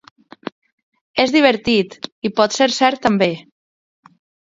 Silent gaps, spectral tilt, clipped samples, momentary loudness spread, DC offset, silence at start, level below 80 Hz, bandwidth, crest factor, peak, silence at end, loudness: 2.12-2.22 s; -4 dB/octave; under 0.1%; 20 LU; under 0.1%; 1.15 s; -56 dBFS; 7.8 kHz; 18 dB; 0 dBFS; 1.1 s; -16 LUFS